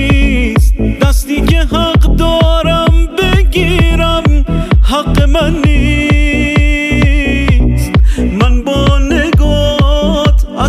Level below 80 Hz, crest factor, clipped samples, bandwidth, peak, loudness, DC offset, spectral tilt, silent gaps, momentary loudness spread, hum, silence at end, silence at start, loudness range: -12 dBFS; 8 dB; under 0.1%; 14.5 kHz; 0 dBFS; -11 LUFS; under 0.1%; -6 dB/octave; none; 2 LU; none; 0 s; 0 s; 0 LU